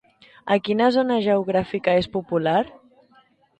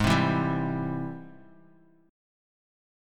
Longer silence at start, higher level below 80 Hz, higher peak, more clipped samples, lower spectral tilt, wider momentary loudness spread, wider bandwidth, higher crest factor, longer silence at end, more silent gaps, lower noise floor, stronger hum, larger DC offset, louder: first, 0.45 s vs 0 s; second, -56 dBFS vs -50 dBFS; about the same, -6 dBFS vs -8 dBFS; neither; about the same, -7 dB/octave vs -6.5 dB/octave; second, 6 LU vs 19 LU; second, 9 kHz vs 16 kHz; second, 16 dB vs 22 dB; second, 0.9 s vs 1.75 s; neither; about the same, -58 dBFS vs -59 dBFS; neither; neither; first, -21 LUFS vs -28 LUFS